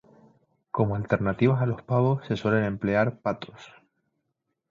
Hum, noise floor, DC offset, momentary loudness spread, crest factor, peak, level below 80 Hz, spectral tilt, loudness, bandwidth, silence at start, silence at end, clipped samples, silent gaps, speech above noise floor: none; -80 dBFS; under 0.1%; 8 LU; 20 dB; -8 dBFS; -54 dBFS; -9 dB/octave; -26 LUFS; 7.2 kHz; 0.75 s; 1.05 s; under 0.1%; none; 55 dB